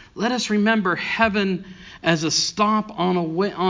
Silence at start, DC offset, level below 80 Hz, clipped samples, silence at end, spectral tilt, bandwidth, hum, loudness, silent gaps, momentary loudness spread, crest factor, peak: 0 s; under 0.1%; -52 dBFS; under 0.1%; 0 s; -4 dB/octave; 7.6 kHz; none; -21 LUFS; none; 6 LU; 20 dB; -2 dBFS